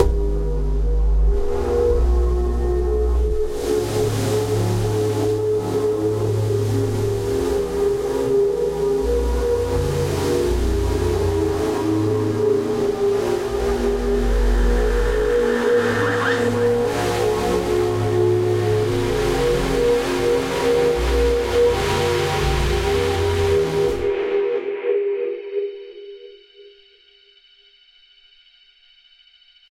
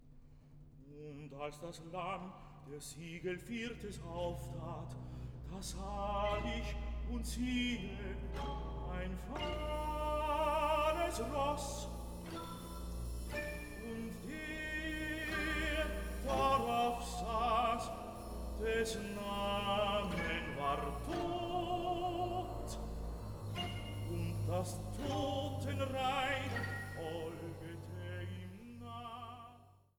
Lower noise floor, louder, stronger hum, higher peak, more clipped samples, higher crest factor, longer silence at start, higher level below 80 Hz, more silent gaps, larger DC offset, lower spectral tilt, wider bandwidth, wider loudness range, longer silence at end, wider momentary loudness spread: second, -53 dBFS vs -62 dBFS; first, -20 LUFS vs -40 LUFS; neither; first, -2 dBFS vs -22 dBFS; neither; about the same, 16 dB vs 18 dB; about the same, 0 s vs 0 s; first, -26 dBFS vs -48 dBFS; neither; neither; about the same, -6 dB/octave vs -5 dB/octave; second, 16 kHz vs over 20 kHz; second, 3 LU vs 8 LU; first, 3.05 s vs 0.3 s; second, 4 LU vs 13 LU